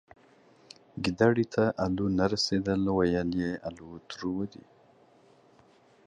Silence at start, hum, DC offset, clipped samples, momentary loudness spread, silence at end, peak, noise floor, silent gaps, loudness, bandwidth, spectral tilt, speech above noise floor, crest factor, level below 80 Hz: 0.95 s; none; under 0.1%; under 0.1%; 15 LU; 1.6 s; -10 dBFS; -60 dBFS; none; -29 LUFS; 10.5 kHz; -6 dB/octave; 32 dB; 20 dB; -54 dBFS